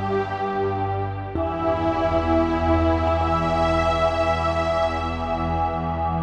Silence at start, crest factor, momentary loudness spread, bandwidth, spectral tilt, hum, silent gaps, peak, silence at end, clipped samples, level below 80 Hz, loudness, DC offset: 0 s; 14 dB; 5 LU; 9 kHz; -7 dB/octave; none; none; -8 dBFS; 0 s; under 0.1%; -34 dBFS; -22 LUFS; under 0.1%